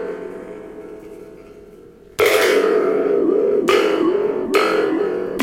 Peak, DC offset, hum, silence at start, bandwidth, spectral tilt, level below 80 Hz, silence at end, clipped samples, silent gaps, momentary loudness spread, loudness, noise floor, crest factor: -2 dBFS; under 0.1%; none; 0 s; 16.5 kHz; -4 dB/octave; -54 dBFS; 0 s; under 0.1%; none; 21 LU; -17 LUFS; -43 dBFS; 16 dB